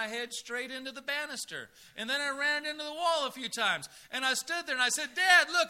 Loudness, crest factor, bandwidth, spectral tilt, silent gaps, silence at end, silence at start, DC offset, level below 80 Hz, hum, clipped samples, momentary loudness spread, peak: -30 LUFS; 24 dB; 16 kHz; 0 dB/octave; none; 0 s; 0 s; under 0.1%; -78 dBFS; none; under 0.1%; 13 LU; -8 dBFS